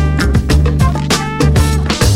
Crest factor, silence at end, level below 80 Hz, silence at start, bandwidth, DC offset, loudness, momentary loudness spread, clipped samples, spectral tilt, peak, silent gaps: 10 dB; 0 s; -16 dBFS; 0 s; 16 kHz; under 0.1%; -13 LUFS; 3 LU; under 0.1%; -5.5 dB/octave; 0 dBFS; none